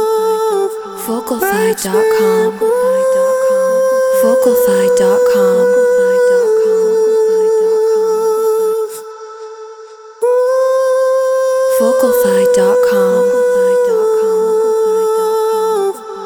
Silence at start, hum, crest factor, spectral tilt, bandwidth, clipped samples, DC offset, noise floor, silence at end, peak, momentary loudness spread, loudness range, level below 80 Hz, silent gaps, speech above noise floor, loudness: 0 s; none; 12 dB; -4 dB/octave; 18.5 kHz; under 0.1%; under 0.1%; -34 dBFS; 0 s; 0 dBFS; 8 LU; 4 LU; -58 dBFS; none; 23 dB; -12 LUFS